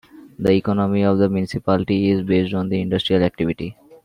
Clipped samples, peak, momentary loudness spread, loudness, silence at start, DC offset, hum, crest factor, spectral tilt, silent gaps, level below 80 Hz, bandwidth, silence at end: under 0.1%; -4 dBFS; 6 LU; -19 LUFS; 0.15 s; under 0.1%; none; 16 dB; -8 dB/octave; none; -50 dBFS; 10.5 kHz; 0.3 s